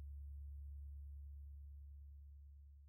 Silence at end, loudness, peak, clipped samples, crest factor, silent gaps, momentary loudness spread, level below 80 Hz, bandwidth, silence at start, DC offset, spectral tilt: 0 s; -56 LUFS; -46 dBFS; under 0.1%; 6 dB; none; 7 LU; -54 dBFS; 0.3 kHz; 0 s; under 0.1%; -8 dB/octave